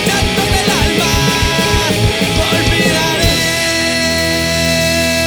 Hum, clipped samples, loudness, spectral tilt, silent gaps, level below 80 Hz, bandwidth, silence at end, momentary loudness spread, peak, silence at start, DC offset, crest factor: none; under 0.1%; -12 LUFS; -3.5 dB/octave; none; -24 dBFS; over 20 kHz; 0 s; 1 LU; 0 dBFS; 0 s; under 0.1%; 12 dB